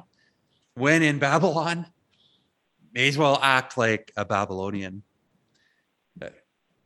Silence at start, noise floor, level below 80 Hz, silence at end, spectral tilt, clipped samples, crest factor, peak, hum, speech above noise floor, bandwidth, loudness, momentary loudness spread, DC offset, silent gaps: 0.75 s; -70 dBFS; -70 dBFS; 0.55 s; -5 dB/octave; under 0.1%; 24 dB; -2 dBFS; none; 47 dB; 12.5 kHz; -23 LUFS; 22 LU; under 0.1%; none